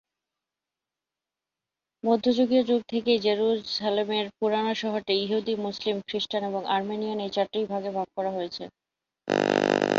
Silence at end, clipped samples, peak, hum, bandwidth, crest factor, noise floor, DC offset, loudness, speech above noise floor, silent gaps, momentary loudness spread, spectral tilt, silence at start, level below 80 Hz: 0 s; under 0.1%; -4 dBFS; none; 7.8 kHz; 22 dB; -89 dBFS; under 0.1%; -27 LUFS; 63 dB; none; 7 LU; -5 dB/octave; 2.05 s; -70 dBFS